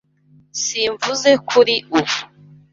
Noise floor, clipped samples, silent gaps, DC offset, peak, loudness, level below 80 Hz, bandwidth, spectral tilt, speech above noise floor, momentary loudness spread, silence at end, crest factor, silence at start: -53 dBFS; under 0.1%; none; under 0.1%; -2 dBFS; -17 LUFS; -60 dBFS; 7.8 kHz; -2 dB/octave; 36 dB; 9 LU; 0.45 s; 18 dB; 0.55 s